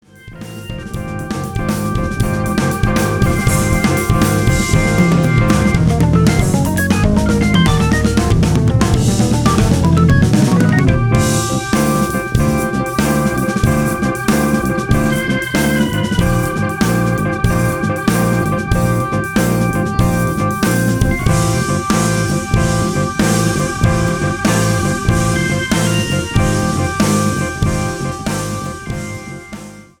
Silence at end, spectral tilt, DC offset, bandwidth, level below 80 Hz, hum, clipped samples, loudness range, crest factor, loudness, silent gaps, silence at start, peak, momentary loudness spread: 0.2 s; -5.5 dB/octave; under 0.1%; over 20 kHz; -26 dBFS; none; under 0.1%; 3 LU; 14 dB; -15 LUFS; none; 0.25 s; 0 dBFS; 8 LU